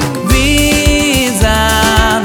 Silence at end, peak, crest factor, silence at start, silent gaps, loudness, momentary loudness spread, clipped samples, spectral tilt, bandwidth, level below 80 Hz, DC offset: 0 s; 0 dBFS; 10 dB; 0 s; none; -10 LUFS; 2 LU; under 0.1%; -3.5 dB/octave; over 20 kHz; -16 dBFS; under 0.1%